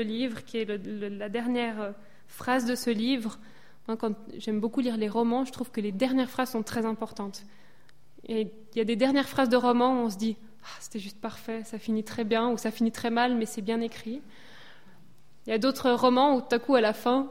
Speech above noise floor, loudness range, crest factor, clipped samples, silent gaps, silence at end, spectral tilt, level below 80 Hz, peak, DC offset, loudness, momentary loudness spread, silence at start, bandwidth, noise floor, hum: 34 dB; 4 LU; 20 dB; under 0.1%; none; 0 s; -5 dB/octave; -66 dBFS; -10 dBFS; 0.5%; -28 LUFS; 15 LU; 0 s; 16.5 kHz; -61 dBFS; none